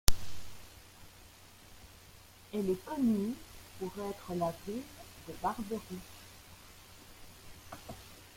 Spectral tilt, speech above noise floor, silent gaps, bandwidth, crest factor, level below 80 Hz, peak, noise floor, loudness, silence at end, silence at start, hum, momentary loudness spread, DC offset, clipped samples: -5 dB/octave; 21 dB; none; 16.5 kHz; 32 dB; -46 dBFS; -4 dBFS; -56 dBFS; -38 LUFS; 0.1 s; 0.1 s; none; 20 LU; under 0.1%; under 0.1%